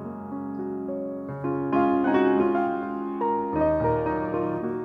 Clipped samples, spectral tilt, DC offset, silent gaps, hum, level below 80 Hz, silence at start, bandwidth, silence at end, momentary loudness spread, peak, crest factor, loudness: under 0.1%; -10 dB/octave; under 0.1%; none; none; -50 dBFS; 0 s; 4.9 kHz; 0 s; 11 LU; -10 dBFS; 16 dB; -26 LUFS